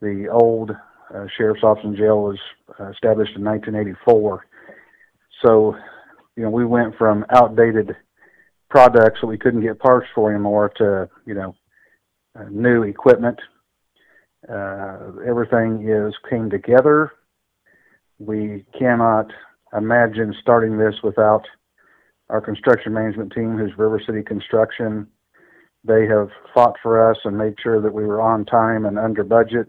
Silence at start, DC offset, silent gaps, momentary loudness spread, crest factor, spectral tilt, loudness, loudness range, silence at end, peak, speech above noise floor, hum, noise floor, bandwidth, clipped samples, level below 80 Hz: 0 s; under 0.1%; none; 15 LU; 18 dB; -8.5 dB/octave; -17 LUFS; 5 LU; 0.05 s; 0 dBFS; 49 dB; none; -66 dBFS; 6.4 kHz; under 0.1%; -56 dBFS